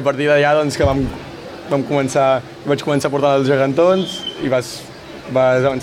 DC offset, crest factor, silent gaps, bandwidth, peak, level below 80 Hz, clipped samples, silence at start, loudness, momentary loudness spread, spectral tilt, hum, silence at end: under 0.1%; 14 dB; none; 15.5 kHz; -2 dBFS; -40 dBFS; under 0.1%; 0 s; -16 LUFS; 16 LU; -5.5 dB/octave; none; 0 s